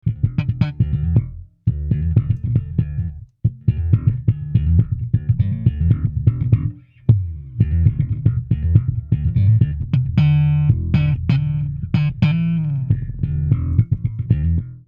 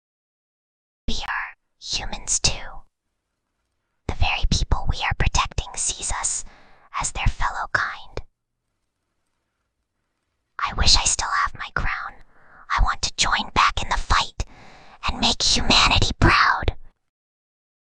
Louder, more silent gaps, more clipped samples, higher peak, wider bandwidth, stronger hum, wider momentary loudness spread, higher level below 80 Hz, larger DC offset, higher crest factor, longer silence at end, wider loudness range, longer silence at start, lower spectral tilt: about the same, -19 LUFS vs -21 LUFS; neither; neither; about the same, 0 dBFS vs -2 dBFS; second, 5.2 kHz vs 10 kHz; neither; second, 7 LU vs 19 LU; about the same, -28 dBFS vs -30 dBFS; neither; about the same, 18 dB vs 22 dB; second, 0.05 s vs 1 s; second, 3 LU vs 9 LU; second, 0.05 s vs 1.1 s; first, -10.5 dB/octave vs -2 dB/octave